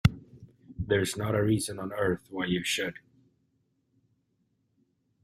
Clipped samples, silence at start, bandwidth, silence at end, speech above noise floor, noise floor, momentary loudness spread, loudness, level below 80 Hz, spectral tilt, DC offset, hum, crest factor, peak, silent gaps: under 0.1%; 0.05 s; 16 kHz; 2.3 s; 45 dB; -74 dBFS; 11 LU; -30 LUFS; -52 dBFS; -5 dB/octave; under 0.1%; none; 26 dB; -6 dBFS; none